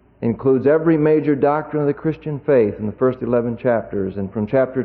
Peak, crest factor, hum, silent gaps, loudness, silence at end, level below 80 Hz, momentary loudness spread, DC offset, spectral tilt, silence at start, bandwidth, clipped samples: -6 dBFS; 12 dB; none; none; -19 LUFS; 0 s; -50 dBFS; 9 LU; under 0.1%; -12 dB/octave; 0.2 s; 4.5 kHz; under 0.1%